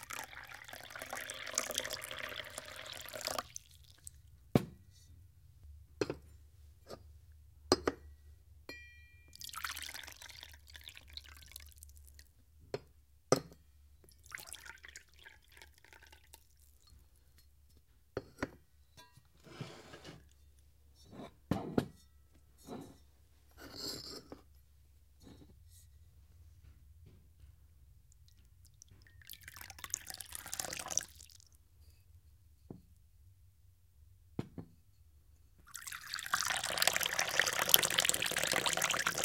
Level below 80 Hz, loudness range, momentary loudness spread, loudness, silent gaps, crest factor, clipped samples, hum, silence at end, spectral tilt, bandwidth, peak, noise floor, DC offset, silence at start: -64 dBFS; 20 LU; 27 LU; -37 LUFS; none; 42 dB; under 0.1%; none; 0 s; -2 dB/octave; 17 kHz; 0 dBFS; -67 dBFS; under 0.1%; 0 s